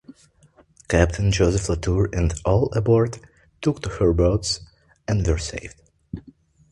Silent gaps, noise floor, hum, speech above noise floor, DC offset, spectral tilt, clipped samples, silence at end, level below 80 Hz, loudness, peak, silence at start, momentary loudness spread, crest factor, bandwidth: none; -56 dBFS; none; 36 dB; under 0.1%; -6 dB/octave; under 0.1%; 0.5 s; -32 dBFS; -22 LUFS; -2 dBFS; 0.1 s; 19 LU; 22 dB; 11.5 kHz